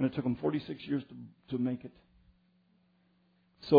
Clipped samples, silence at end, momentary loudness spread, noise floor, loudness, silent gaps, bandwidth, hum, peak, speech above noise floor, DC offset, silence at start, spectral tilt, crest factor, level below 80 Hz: under 0.1%; 0 s; 17 LU; -70 dBFS; -35 LUFS; none; 5 kHz; none; -10 dBFS; 35 dB; under 0.1%; 0 s; -7 dB/octave; 24 dB; -68 dBFS